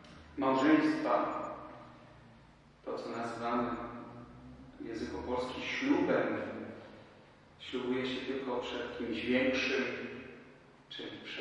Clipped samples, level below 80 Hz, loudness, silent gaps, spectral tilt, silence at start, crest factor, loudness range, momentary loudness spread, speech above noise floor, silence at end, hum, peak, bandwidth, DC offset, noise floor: under 0.1%; -64 dBFS; -34 LUFS; none; -5.5 dB/octave; 0 s; 22 dB; 7 LU; 21 LU; 26 dB; 0 s; none; -14 dBFS; 10.5 kHz; under 0.1%; -60 dBFS